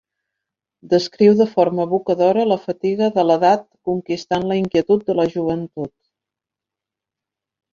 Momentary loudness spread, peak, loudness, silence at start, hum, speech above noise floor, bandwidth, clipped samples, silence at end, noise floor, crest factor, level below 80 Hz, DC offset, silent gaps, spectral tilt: 10 LU; -2 dBFS; -18 LUFS; 0.85 s; none; 69 dB; 7.4 kHz; under 0.1%; 1.85 s; -86 dBFS; 16 dB; -58 dBFS; under 0.1%; none; -7 dB/octave